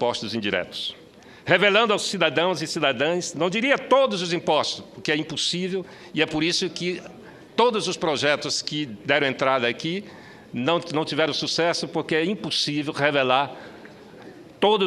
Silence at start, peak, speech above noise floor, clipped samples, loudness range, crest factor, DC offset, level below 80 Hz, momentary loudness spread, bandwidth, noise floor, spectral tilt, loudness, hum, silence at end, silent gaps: 0 s; -2 dBFS; 21 dB; under 0.1%; 3 LU; 22 dB; under 0.1%; -64 dBFS; 10 LU; 13 kHz; -44 dBFS; -3.5 dB/octave; -23 LUFS; none; 0 s; none